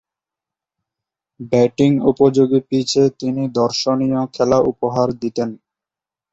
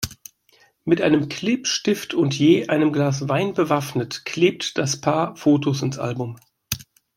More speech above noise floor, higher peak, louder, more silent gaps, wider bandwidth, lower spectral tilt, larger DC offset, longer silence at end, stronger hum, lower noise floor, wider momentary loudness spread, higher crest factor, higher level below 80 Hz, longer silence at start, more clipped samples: first, 72 dB vs 38 dB; about the same, -2 dBFS vs -4 dBFS; first, -17 LUFS vs -21 LUFS; neither; second, 8 kHz vs 16.5 kHz; about the same, -6 dB/octave vs -5 dB/octave; neither; first, 0.8 s vs 0.35 s; neither; first, -88 dBFS vs -58 dBFS; second, 8 LU vs 12 LU; about the same, 16 dB vs 18 dB; about the same, -54 dBFS vs -56 dBFS; first, 1.4 s vs 0 s; neither